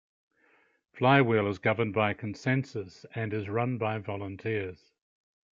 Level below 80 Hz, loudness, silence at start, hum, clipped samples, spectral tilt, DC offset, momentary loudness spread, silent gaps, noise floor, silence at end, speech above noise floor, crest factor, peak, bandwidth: -72 dBFS; -29 LUFS; 0.95 s; none; under 0.1%; -7.5 dB/octave; under 0.1%; 14 LU; none; -67 dBFS; 0.8 s; 38 dB; 24 dB; -8 dBFS; 7.6 kHz